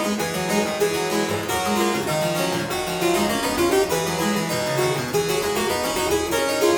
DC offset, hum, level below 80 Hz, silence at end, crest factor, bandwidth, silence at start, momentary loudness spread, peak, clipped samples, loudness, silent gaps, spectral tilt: under 0.1%; none; -48 dBFS; 0 s; 14 dB; over 20 kHz; 0 s; 3 LU; -8 dBFS; under 0.1%; -22 LUFS; none; -3.5 dB/octave